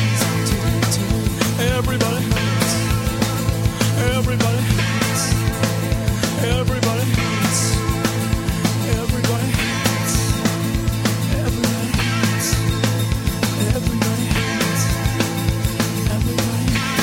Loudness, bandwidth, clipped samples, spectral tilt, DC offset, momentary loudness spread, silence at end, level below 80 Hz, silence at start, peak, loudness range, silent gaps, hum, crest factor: -19 LUFS; 16.5 kHz; under 0.1%; -4.5 dB/octave; under 0.1%; 2 LU; 0 s; -28 dBFS; 0 s; -2 dBFS; 1 LU; none; none; 16 dB